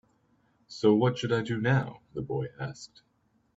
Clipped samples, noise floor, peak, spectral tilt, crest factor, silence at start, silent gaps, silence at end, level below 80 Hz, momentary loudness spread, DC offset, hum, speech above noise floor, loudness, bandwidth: under 0.1%; -68 dBFS; -10 dBFS; -7 dB/octave; 20 dB; 0.7 s; none; 0.7 s; -64 dBFS; 20 LU; under 0.1%; none; 40 dB; -29 LUFS; 8 kHz